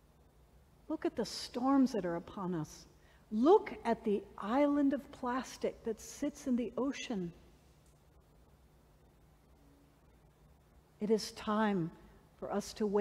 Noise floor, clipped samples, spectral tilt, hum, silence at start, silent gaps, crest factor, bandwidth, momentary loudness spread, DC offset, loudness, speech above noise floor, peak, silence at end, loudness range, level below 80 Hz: -64 dBFS; under 0.1%; -5.5 dB/octave; none; 0.9 s; none; 20 dB; 15 kHz; 12 LU; under 0.1%; -35 LUFS; 30 dB; -16 dBFS; 0 s; 10 LU; -64 dBFS